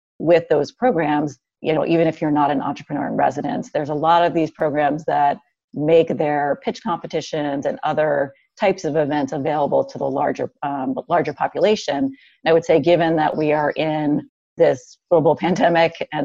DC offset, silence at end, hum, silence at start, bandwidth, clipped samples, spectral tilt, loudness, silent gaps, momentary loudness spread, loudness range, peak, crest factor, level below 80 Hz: under 0.1%; 0 s; none; 0.2 s; 7.6 kHz; under 0.1%; -6.5 dB/octave; -20 LUFS; 5.64-5.68 s, 14.29-14.56 s; 9 LU; 3 LU; -4 dBFS; 16 dB; -58 dBFS